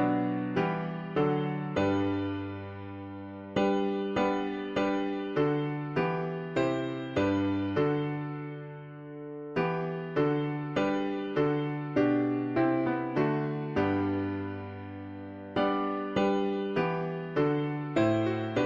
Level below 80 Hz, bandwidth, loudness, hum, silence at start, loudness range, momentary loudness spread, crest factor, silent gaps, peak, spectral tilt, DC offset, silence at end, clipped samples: -62 dBFS; 7.4 kHz; -30 LUFS; none; 0 s; 3 LU; 13 LU; 16 dB; none; -14 dBFS; -8 dB/octave; under 0.1%; 0 s; under 0.1%